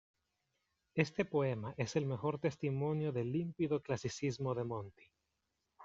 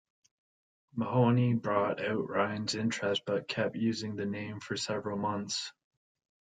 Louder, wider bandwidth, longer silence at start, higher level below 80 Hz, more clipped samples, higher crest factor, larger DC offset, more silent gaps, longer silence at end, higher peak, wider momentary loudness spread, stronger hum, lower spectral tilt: second, -38 LUFS vs -32 LUFS; second, 7.8 kHz vs 9.4 kHz; about the same, 0.95 s vs 0.95 s; about the same, -72 dBFS vs -72 dBFS; neither; first, 24 dB vs 18 dB; neither; neither; second, 0 s vs 0.7 s; about the same, -16 dBFS vs -14 dBFS; second, 5 LU vs 9 LU; neither; about the same, -6.5 dB/octave vs -5.5 dB/octave